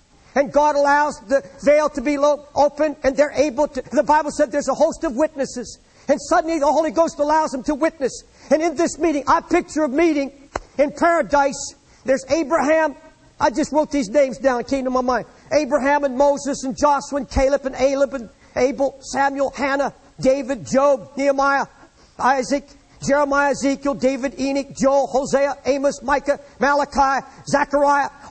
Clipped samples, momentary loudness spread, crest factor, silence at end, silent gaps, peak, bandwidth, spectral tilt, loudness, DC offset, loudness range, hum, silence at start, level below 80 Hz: under 0.1%; 7 LU; 14 dB; 0 s; none; -4 dBFS; 8.8 kHz; -4 dB/octave; -19 LUFS; under 0.1%; 2 LU; none; 0.35 s; -44 dBFS